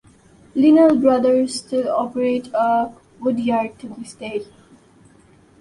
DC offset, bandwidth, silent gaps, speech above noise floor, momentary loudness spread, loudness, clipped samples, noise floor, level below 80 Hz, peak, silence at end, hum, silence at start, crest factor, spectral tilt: under 0.1%; 11.5 kHz; none; 34 dB; 16 LU; -18 LUFS; under 0.1%; -51 dBFS; -60 dBFS; -4 dBFS; 1.15 s; none; 0.55 s; 16 dB; -5.5 dB/octave